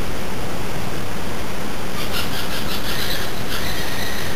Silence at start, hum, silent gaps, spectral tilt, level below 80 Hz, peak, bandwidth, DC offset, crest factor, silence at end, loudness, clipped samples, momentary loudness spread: 0 s; none; none; -3.5 dB/octave; -36 dBFS; -6 dBFS; 15.5 kHz; 20%; 16 dB; 0 s; -25 LUFS; under 0.1%; 4 LU